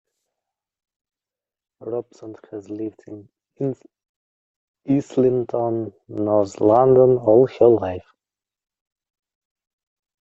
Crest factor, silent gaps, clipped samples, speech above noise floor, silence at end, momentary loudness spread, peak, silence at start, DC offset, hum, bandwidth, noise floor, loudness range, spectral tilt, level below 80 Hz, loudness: 20 dB; 4.09-4.74 s; under 0.1%; over 71 dB; 2.2 s; 22 LU; -2 dBFS; 1.8 s; under 0.1%; none; 7.6 kHz; under -90 dBFS; 15 LU; -9 dB/octave; -58 dBFS; -19 LUFS